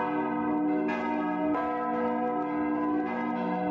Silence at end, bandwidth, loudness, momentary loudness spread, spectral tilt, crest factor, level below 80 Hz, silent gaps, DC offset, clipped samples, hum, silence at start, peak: 0 s; 5.4 kHz; -29 LUFS; 2 LU; -8.5 dB/octave; 10 dB; -64 dBFS; none; under 0.1%; under 0.1%; none; 0 s; -18 dBFS